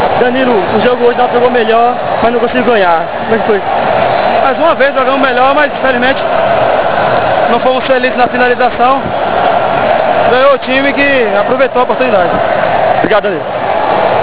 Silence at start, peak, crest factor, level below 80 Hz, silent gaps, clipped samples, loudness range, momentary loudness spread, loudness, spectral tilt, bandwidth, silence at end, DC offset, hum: 0 s; 0 dBFS; 10 dB; -40 dBFS; none; 0.5%; 1 LU; 3 LU; -9 LUFS; -8.5 dB/octave; 4 kHz; 0 s; 5%; none